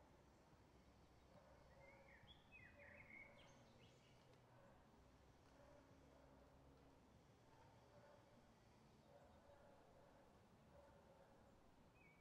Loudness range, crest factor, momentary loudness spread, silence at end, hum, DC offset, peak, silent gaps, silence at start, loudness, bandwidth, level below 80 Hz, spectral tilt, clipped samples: 2 LU; 16 dB; 7 LU; 0 s; none; under 0.1%; -54 dBFS; none; 0 s; -66 LUFS; 8.4 kHz; -80 dBFS; -5 dB/octave; under 0.1%